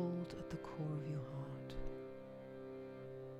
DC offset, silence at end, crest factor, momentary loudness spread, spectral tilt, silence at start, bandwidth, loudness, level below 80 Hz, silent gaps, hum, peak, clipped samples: under 0.1%; 0 s; 16 dB; 9 LU; -8 dB/octave; 0 s; 12.5 kHz; -48 LUFS; -58 dBFS; none; none; -30 dBFS; under 0.1%